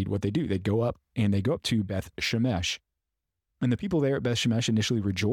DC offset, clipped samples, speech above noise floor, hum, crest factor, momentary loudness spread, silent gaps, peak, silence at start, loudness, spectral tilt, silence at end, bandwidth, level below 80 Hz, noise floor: under 0.1%; under 0.1%; 59 dB; none; 12 dB; 5 LU; none; -16 dBFS; 0 s; -28 LUFS; -5.5 dB/octave; 0 s; 15.5 kHz; -54 dBFS; -85 dBFS